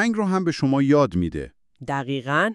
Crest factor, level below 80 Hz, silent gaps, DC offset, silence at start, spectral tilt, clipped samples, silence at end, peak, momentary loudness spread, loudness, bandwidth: 16 dB; -48 dBFS; none; under 0.1%; 0 s; -6.5 dB/octave; under 0.1%; 0 s; -6 dBFS; 15 LU; -22 LUFS; 11 kHz